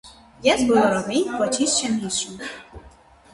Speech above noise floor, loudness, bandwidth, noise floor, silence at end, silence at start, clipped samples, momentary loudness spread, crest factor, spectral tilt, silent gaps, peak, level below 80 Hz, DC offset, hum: 28 dB; -21 LUFS; 11.5 kHz; -49 dBFS; 0.45 s; 0.05 s; under 0.1%; 15 LU; 18 dB; -3 dB/octave; none; -4 dBFS; -52 dBFS; under 0.1%; none